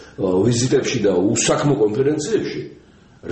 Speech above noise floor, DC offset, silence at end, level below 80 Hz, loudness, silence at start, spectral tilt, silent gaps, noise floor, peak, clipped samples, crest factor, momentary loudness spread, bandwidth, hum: 23 dB; under 0.1%; 0 s; -50 dBFS; -18 LUFS; 0 s; -5 dB/octave; none; -41 dBFS; -4 dBFS; under 0.1%; 14 dB; 12 LU; 8.8 kHz; none